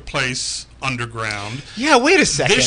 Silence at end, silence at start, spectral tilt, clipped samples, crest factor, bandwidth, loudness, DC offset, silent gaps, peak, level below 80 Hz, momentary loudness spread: 0 s; 0.05 s; -3 dB/octave; under 0.1%; 18 dB; 10.5 kHz; -17 LUFS; under 0.1%; none; 0 dBFS; -42 dBFS; 12 LU